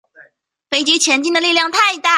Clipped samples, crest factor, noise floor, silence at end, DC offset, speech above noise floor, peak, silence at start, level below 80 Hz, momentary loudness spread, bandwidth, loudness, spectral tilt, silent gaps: under 0.1%; 16 dB; -54 dBFS; 0 s; under 0.1%; 39 dB; 0 dBFS; 0.2 s; -68 dBFS; 4 LU; 14 kHz; -13 LUFS; 1 dB/octave; none